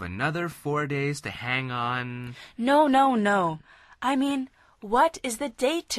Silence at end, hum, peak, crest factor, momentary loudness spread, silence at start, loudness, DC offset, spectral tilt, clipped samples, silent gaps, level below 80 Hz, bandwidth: 0 s; none; -10 dBFS; 16 dB; 13 LU; 0 s; -26 LUFS; under 0.1%; -5 dB/octave; under 0.1%; none; -56 dBFS; 13.5 kHz